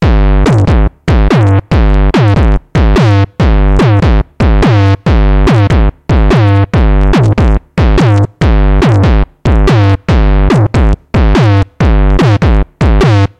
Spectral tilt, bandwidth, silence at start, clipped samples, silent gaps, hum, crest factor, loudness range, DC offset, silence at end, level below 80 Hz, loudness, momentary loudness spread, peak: -8 dB/octave; 8.6 kHz; 0 s; under 0.1%; none; none; 4 dB; 1 LU; under 0.1%; 0.15 s; -10 dBFS; -9 LUFS; 4 LU; -2 dBFS